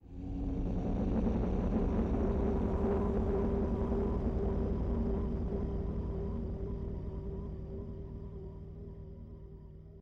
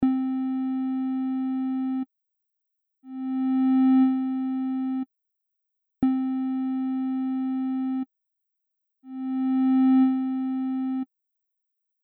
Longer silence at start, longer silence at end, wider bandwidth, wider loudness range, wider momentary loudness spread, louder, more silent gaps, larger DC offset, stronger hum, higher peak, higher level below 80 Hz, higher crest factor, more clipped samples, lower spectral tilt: about the same, 0.05 s vs 0 s; second, 0 s vs 1 s; first, 6.2 kHz vs 4.1 kHz; first, 10 LU vs 4 LU; about the same, 15 LU vs 13 LU; second, -35 LUFS vs -26 LUFS; neither; neither; neither; second, -22 dBFS vs -12 dBFS; first, -38 dBFS vs -66 dBFS; about the same, 14 dB vs 14 dB; neither; about the same, -10.5 dB/octave vs -10 dB/octave